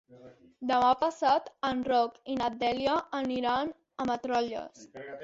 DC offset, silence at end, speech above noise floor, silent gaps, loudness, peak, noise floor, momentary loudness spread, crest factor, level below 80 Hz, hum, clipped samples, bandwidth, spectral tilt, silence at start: under 0.1%; 0 s; 25 dB; none; -30 LUFS; -12 dBFS; -54 dBFS; 12 LU; 18 dB; -64 dBFS; none; under 0.1%; 7.8 kHz; -4.5 dB/octave; 0.1 s